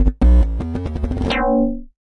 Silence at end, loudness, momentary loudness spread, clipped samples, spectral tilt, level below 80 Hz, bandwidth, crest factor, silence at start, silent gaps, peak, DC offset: 0.25 s; -19 LUFS; 10 LU; under 0.1%; -8 dB/octave; -18 dBFS; 6.2 kHz; 12 dB; 0 s; none; -4 dBFS; under 0.1%